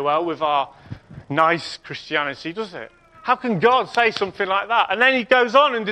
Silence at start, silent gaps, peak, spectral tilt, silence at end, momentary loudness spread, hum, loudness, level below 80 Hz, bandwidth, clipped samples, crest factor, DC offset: 0 s; none; -2 dBFS; -5 dB/octave; 0 s; 16 LU; none; -19 LUFS; -60 dBFS; 11 kHz; under 0.1%; 18 dB; under 0.1%